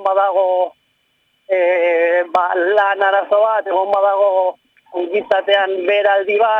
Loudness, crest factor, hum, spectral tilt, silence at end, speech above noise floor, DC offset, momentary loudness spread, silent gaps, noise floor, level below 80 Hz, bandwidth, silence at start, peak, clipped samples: -15 LUFS; 12 dB; none; -4 dB/octave; 0 s; 48 dB; under 0.1%; 6 LU; none; -63 dBFS; -72 dBFS; 5.4 kHz; 0 s; -2 dBFS; under 0.1%